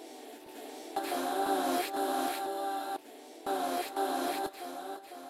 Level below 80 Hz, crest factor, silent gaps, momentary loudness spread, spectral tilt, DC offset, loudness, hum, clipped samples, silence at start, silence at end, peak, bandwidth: -78 dBFS; 16 dB; none; 15 LU; -2 dB/octave; under 0.1%; -34 LUFS; none; under 0.1%; 0 s; 0 s; -18 dBFS; 16 kHz